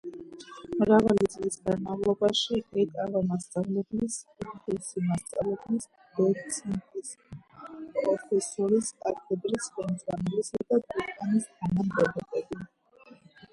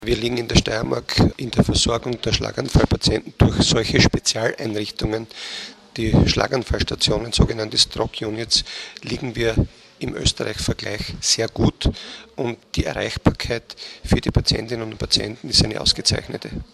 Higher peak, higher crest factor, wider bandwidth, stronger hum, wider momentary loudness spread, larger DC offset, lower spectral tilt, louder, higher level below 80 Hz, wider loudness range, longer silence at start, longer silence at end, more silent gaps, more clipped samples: second, -10 dBFS vs 0 dBFS; about the same, 20 dB vs 20 dB; second, 11.5 kHz vs 13.5 kHz; neither; first, 16 LU vs 12 LU; neither; about the same, -5 dB/octave vs -4 dB/octave; second, -29 LUFS vs -20 LUFS; second, -60 dBFS vs -32 dBFS; about the same, 5 LU vs 4 LU; about the same, 0.05 s vs 0 s; first, 0.4 s vs 0.1 s; neither; neither